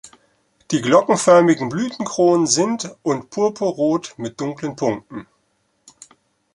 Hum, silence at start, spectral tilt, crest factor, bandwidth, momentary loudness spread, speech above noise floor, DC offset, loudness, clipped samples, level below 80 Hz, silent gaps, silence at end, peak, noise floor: none; 0.05 s; -4.5 dB/octave; 18 dB; 11.5 kHz; 13 LU; 48 dB; under 0.1%; -18 LUFS; under 0.1%; -62 dBFS; none; 1.35 s; -2 dBFS; -66 dBFS